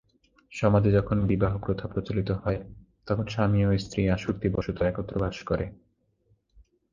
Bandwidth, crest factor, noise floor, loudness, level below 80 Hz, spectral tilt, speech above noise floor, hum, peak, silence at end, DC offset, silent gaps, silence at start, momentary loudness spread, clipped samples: 7.4 kHz; 20 dB; -68 dBFS; -27 LUFS; -42 dBFS; -8 dB/octave; 42 dB; none; -8 dBFS; 0.3 s; under 0.1%; none; 0.5 s; 8 LU; under 0.1%